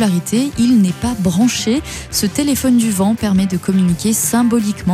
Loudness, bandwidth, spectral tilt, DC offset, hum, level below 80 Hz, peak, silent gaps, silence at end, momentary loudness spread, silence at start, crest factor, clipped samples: -15 LUFS; 15.5 kHz; -5 dB/octave; under 0.1%; none; -38 dBFS; -2 dBFS; none; 0 s; 4 LU; 0 s; 12 dB; under 0.1%